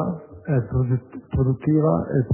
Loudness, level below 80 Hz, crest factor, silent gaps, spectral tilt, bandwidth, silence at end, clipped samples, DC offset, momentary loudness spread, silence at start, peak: -22 LUFS; -40 dBFS; 14 dB; none; -14 dB/octave; 3.1 kHz; 0 s; under 0.1%; under 0.1%; 9 LU; 0 s; -8 dBFS